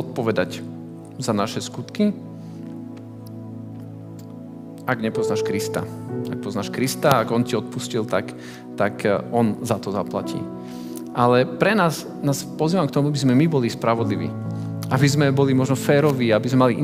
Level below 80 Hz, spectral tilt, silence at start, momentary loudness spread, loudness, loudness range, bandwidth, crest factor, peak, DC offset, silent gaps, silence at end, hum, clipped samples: -60 dBFS; -6 dB/octave; 0 s; 18 LU; -21 LUFS; 8 LU; 16.5 kHz; 20 dB; -2 dBFS; under 0.1%; none; 0 s; none; under 0.1%